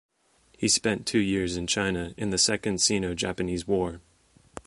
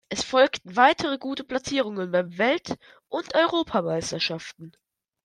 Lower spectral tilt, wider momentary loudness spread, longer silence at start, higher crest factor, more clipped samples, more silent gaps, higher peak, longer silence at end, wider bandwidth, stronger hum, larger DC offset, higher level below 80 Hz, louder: about the same, -3 dB/octave vs -4 dB/octave; second, 8 LU vs 14 LU; first, 0.6 s vs 0.1 s; about the same, 18 dB vs 22 dB; neither; neither; second, -10 dBFS vs -4 dBFS; second, 0.05 s vs 0.55 s; about the same, 11.5 kHz vs 11 kHz; neither; neither; first, -50 dBFS vs -62 dBFS; about the same, -26 LUFS vs -24 LUFS